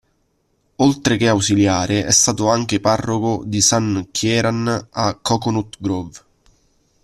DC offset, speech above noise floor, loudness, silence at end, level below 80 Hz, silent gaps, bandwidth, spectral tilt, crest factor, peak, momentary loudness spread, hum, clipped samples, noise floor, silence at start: under 0.1%; 47 dB; -17 LUFS; 0.85 s; -48 dBFS; none; 14 kHz; -4 dB/octave; 18 dB; 0 dBFS; 8 LU; none; under 0.1%; -65 dBFS; 0.8 s